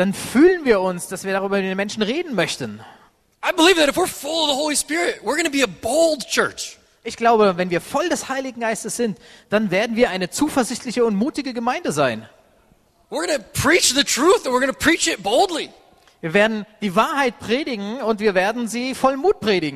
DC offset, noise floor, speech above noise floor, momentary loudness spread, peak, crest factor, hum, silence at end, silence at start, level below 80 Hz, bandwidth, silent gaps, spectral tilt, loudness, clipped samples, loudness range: under 0.1%; -57 dBFS; 38 dB; 10 LU; -2 dBFS; 18 dB; none; 0 s; 0 s; -52 dBFS; 13.5 kHz; none; -3.5 dB/octave; -19 LUFS; under 0.1%; 4 LU